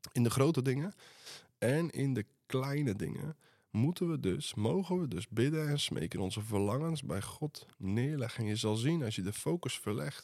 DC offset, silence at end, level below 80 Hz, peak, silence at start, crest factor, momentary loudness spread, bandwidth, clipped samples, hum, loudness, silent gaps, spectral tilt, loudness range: under 0.1%; 0 s; -70 dBFS; -14 dBFS; 0.05 s; 20 dB; 10 LU; 15 kHz; under 0.1%; none; -35 LUFS; none; -6 dB/octave; 2 LU